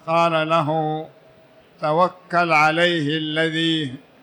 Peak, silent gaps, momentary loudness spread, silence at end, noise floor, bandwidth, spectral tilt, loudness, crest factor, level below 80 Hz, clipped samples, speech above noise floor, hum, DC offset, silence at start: -6 dBFS; none; 11 LU; 0.25 s; -51 dBFS; 19.5 kHz; -5.5 dB/octave; -19 LUFS; 14 dB; -68 dBFS; under 0.1%; 31 dB; none; under 0.1%; 0.05 s